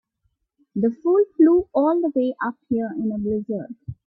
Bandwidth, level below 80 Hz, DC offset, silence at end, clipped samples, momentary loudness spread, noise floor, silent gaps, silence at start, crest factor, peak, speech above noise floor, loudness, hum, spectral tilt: 4.2 kHz; -56 dBFS; under 0.1%; 0.15 s; under 0.1%; 13 LU; -72 dBFS; none; 0.75 s; 16 dB; -6 dBFS; 51 dB; -21 LUFS; none; -11 dB/octave